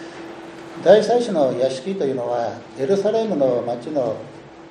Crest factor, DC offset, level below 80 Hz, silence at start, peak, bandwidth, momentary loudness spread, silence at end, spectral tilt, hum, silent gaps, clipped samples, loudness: 20 dB; under 0.1%; -64 dBFS; 0 s; 0 dBFS; 10 kHz; 21 LU; 0 s; -6 dB/octave; none; none; under 0.1%; -20 LUFS